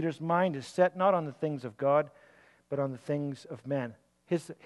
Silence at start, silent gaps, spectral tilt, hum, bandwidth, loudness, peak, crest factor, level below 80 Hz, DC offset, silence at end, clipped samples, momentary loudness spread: 0 s; none; -7 dB/octave; none; 12 kHz; -31 LUFS; -14 dBFS; 18 dB; -78 dBFS; under 0.1%; 0.1 s; under 0.1%; 11 LU